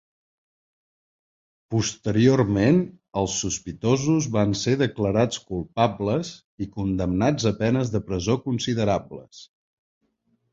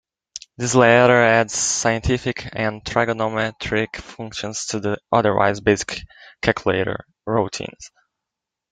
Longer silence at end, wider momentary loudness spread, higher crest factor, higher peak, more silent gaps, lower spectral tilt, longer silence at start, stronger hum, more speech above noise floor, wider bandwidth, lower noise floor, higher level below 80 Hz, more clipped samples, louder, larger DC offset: first, 1.1 s vs 0.85 s; second, 10 LU vs 17 LU; about the same, 20 dB vs 20 dB; about the same, -4 dBFS vs -2 dBFS; first, 6.44-6.58 s vs none; first, -5.5 dB/octave vs -4 dB/octave; first, 1.7 s vs 0.35 s; neither; second, 47 dB vs 65 dB; second, 7.8 kHz vs 9.6 kHz; second, -70 dBFS vs -84 dBFS; about the same, -48 dBFS vs -44 dBFS; neither; second, -23 LUFS vs -19 LUFS; neither